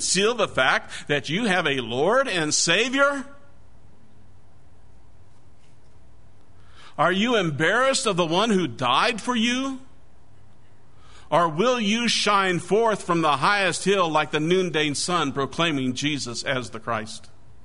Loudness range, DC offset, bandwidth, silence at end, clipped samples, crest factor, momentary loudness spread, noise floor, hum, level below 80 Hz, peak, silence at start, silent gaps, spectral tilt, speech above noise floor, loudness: 5 LU; 1%; 11 kHz; 0.45 s; under 0.1%; 20 dB; 8 LU; -55 dBFS; none; -58 dBFS; -4 dBFS; 0 s; none; -3.5 dB/octave; 33 dB; -22 LUFS